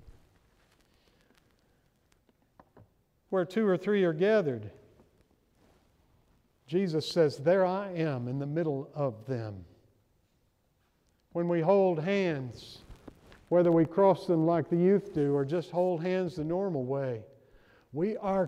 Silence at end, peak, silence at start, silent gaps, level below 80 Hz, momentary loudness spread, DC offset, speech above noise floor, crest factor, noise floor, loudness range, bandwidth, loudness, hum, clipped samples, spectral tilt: 0 s; -12 dBFS; 0.05 s; none; -66 dBFS; 12 LU; under 0.1%; 44 dB; 18 dB; -72 dBFS; 8 LU; 11.5 kHz; -29 LUFS; none; under 0.1%; -8 dB/octave